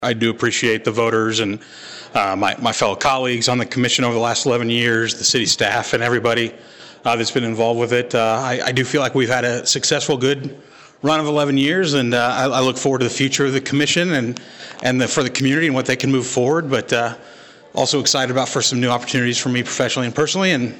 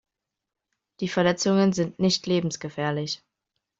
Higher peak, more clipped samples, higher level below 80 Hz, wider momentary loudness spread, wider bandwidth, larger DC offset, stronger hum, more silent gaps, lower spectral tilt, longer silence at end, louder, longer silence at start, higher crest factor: first, -6 dBFS vs -10 dBFS; neither; first, -58 dBFS vs -64 dBFS; second, 5 LU vs 10 LU; first, 16.5 kHz vs 7.8 kHz; neither; neither; neither; second, -3.5 dB/octave vs -5 dB/octave; second, 0 s vs 0.65 s; first, -18 LUFS vs -25 LUFS; second, 0 s vs 1 s; about the same, 12 dB vs 16 dB